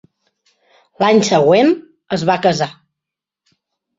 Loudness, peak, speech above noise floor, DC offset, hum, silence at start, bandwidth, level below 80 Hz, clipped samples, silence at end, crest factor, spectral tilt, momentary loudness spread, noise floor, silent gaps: -15 LUFS; -2 dBFS; 71 dB; under 0.1%; none; 1 s; 7.8 kHz; -58 dBFS; under 0.1%; 1.25 s; 16 dB; -5 dB/octave; 11 LU; -84 dBFS; none